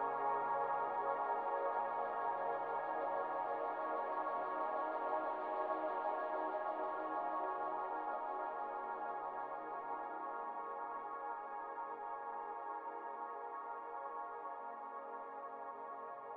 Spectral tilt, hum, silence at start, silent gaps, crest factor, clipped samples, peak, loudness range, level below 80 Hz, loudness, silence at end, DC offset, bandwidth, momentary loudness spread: -2.5 dB/octave; none; 0 s; none; 16 dB; under 0.1%; -26 dBFS; 7 LU; -86 dBFS; -42 LUFS; 0 s; under 0.1%; 5 kHz; 8 LU